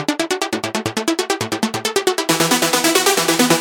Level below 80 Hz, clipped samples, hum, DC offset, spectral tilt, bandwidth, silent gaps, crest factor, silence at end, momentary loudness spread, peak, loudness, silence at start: -60 dBFS; under 0.1%; none; under 0.1%; -2.5 dB/octave; 19.5 kHz; none; 18 dB; 0 s; 7 LU; 0 dBFS; -17 LUFS; 0 s